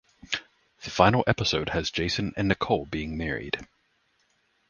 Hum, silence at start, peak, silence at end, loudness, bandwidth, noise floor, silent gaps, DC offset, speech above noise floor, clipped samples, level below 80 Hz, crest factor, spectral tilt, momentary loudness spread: none; 0.3 s; -2 dBFS; 1.05 s; -27 LUFS; 9.8 kHz; -70 dBFS; none; under 0.1%; 44 dB; under 0.1%; -46 dBFS; 26 dB; -5 dB/octave; 12 LU